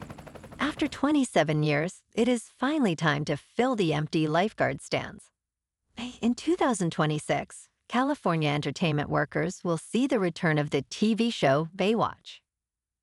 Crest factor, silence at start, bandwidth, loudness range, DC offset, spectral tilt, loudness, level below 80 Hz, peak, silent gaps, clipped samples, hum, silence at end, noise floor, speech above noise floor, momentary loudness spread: 20 dB; 0 s; 12 kHz; 3 LU; under 0.1%; -5.5 dB/octave; -27 LUFS; -60 dBFS; -8 dBFS; none; under 0.1%; none; 0.65 s; -89 dBFS; 62 dB; 7 LU